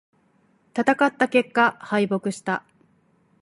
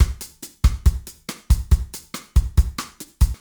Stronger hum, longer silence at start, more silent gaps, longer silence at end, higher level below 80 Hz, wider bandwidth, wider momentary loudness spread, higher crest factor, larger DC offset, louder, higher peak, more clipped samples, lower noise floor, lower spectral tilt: neither; first, 0.75 s vs 0 s; neither; first, 0.8 s vs 0.05 s; second, -72 dBFS vs -22 dBFS; second, 11.5 kHz vs over 20 kHz; second, 9 LU vs 15 LU; about the same, 20 dB vs 16 dB; neither; about the same, -22 LUFS vs -23 LUFS; about the same, -4 dBFS vs -4 dBFS; neither; first, -63 dBFS vs -39 dBFS; about the same, -5.5 dB/octave vs -5 dB/octave